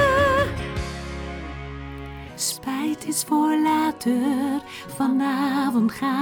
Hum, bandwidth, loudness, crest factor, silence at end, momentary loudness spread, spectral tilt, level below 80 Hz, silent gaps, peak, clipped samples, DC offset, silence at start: none; over 20 kHz; -23 LUFS; 14 dB; 0 s; 15 LU; -4.5 dB/octave; -40 dBFS; none; -8 dBFS; under 0.1%; under 0.1%; 0 s